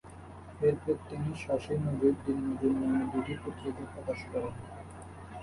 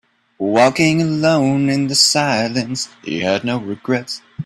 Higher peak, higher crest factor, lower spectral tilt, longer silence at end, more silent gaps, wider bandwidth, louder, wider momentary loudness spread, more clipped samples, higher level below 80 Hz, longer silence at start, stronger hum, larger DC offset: second, -14 dBFS vs 0 dBFS; about the same, 18 dB vs 18 dB; first, -8 dB/octave vs -4 dB/octave; about the same, 0 s vs 0 s; neither; second, 11.5 kHz vs 13.5 kHz; second, -33 LUFS vs -16 LUFS; first, 18 LU vs 11 LU; neither; about the same, -54 dBFS vs -56 dBFS; second, 0.05 s vs 0.4 s; neither; neither